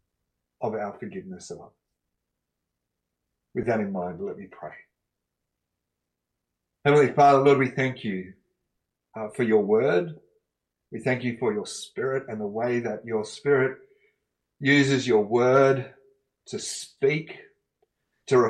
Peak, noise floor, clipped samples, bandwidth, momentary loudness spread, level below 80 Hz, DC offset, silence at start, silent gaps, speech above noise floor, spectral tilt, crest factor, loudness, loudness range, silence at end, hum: -8 dBFS; -83 dBFS; under 0.1%; 11.5 kHz; 21 LU; -68 dBFS; under 0.1%; 0.6 s; none; 59 dB; -5.5 dB/octave; 18 dB; -24 LUFS; 11 LU; 0 s; 60 Hz at -60 dBFS